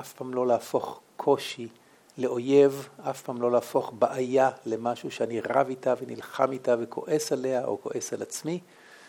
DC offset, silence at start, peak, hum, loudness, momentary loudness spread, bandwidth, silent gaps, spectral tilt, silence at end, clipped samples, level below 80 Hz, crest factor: under 0.1%; 0 s; -8 dBFS; none; -28 LUFS; 11 LU; 17.5 kHz; none; -5 dB/octave; 0 s; under 0.1%; -80 dBFS; 20 dB